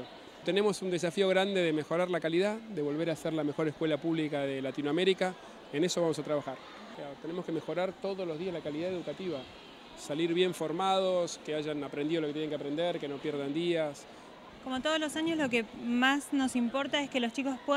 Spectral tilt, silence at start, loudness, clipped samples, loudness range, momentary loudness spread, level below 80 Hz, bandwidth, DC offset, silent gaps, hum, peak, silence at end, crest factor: -5 dB/octave; 0 s; -32 LUFS; under 0.1%; 5 LU; 13 LU; -70 dBFS; 15 kHz; under 0.1%; none; none; -14 dBFS; 0 s; 18 dB